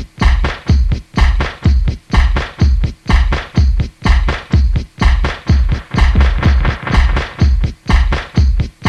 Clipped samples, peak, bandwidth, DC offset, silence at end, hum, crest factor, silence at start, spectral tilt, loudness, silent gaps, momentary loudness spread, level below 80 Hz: under 0.1%; 0 dBFS; 7.8 kHz; under 0.1%; 0 s; none; 12 dB; 0 s; -6.5 dB/octave; -15 LUFS; none; 3 LU; -14 dBFS